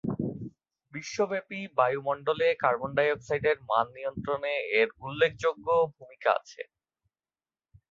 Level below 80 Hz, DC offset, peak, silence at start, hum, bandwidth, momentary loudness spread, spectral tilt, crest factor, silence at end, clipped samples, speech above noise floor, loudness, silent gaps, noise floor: -64 dBFS; under 0.1%; -10 dBFS; 0.05 s; none; 7.6 kHz; 12 LU; -5 dB/octave; 20 dB; 1.3 s; under 0.1%; over 62 dB; -28 LUFS; none; under -90 dBFS